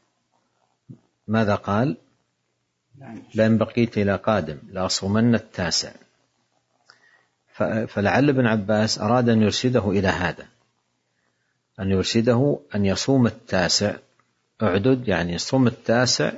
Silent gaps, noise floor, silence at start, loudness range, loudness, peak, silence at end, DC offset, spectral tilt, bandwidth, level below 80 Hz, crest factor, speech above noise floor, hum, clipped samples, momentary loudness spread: none; -74 dBFS; 0.9 s; 4 LU; -21 LUFS; -4 dBFS; 0 s; under 0.1%; -5 dB/octave; 8 kHz; -58 dBFS; 18 dB; 53 dB; none; under 0.1%; 9 LU